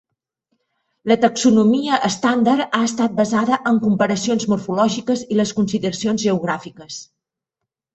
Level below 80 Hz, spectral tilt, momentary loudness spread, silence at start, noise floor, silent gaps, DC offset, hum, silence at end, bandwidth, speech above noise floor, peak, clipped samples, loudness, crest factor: -58 dBFS; -5 dB/octave; 9 LU; 1.05 s; -82 dBFS; none; under 0.1%; none; 0.9 s; 8.2 kHz; 65 dB; -2 dBFS; under 0.1%; -18 LUFS; 16 dB